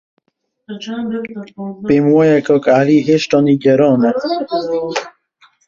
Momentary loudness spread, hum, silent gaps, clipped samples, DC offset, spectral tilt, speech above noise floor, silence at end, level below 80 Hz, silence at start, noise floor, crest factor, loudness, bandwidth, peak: 15 LU; none; none; under 0.1%; under 0.1%; -6.5 dB/octave; 52 dB; 0.6 s; -54 dBFS; 0.7 s; -66 dBFS; 14 dB; -14 LUFS; 7.4 kHz; -2 dBFS